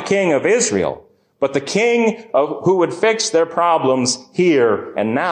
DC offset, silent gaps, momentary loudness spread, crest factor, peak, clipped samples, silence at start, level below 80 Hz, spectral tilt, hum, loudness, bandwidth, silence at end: under 0.1%; none; 6 LU; 12 dB; -4 dBFS; under 0.1%; 0 s; -56 dBFS; -4 dB/octave; none; -17 LUFS; 10.5 kHz; 0 s